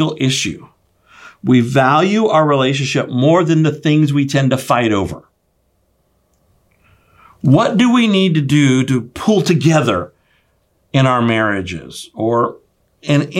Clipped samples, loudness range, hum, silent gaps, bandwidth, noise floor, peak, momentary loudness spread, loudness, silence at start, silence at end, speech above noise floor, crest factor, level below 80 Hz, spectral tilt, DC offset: under 0.1%; 5 LU; none; none; 14.5 kHz; -62 dBFS; 0 dBFS; 10 LU; -14 LUFS; 0 s; 0 s; 48 dB; 14 dB; -52 dBFS; -6 dB/octave; under 0.1%